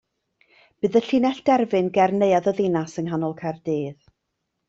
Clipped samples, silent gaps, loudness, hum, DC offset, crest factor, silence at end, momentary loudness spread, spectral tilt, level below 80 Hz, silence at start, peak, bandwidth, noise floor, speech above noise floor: under 0.1%; none; -22 LUFS; none; under 0.1%; 16 dB; 0.75 s; 8 LU; -7 dB/octave; -64 dBFS; 0.85 s; -6 dBFS; 8 kHz; -78 dBFS; 57 dB